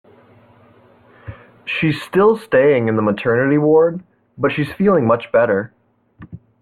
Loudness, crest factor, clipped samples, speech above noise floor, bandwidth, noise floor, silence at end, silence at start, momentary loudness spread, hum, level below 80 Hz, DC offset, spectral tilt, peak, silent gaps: -16 LUFS; 14 dB; under 0.1%; 34 dB; 12.5 kHz; -49 dBFS; 0.25 s; 1.25 s; 19 LU; none; -54 dBFS; under 0.1%; -8 dB/octave; -2 dBFS; none